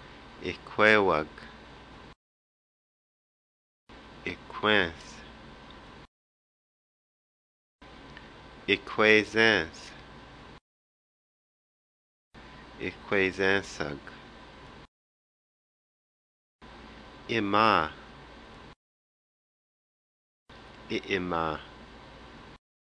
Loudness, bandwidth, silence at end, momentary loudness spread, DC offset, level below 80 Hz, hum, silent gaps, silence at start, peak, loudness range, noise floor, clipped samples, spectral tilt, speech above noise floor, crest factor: -27 LUFS; 10.5 kHz; 0.3 s; 27 LU; under 0.1%; -58 dBFS; none; 2.16-3.87 s, 6.07-7.79 s, 10.61-12.31 s, 14.88-16.59 s, 18.76-20.46 s; 0 s; -6 dBFS; 17 LU; -49 dBFS; under 0.1%; -4.5 dB/octave; 23 dB; 26 dB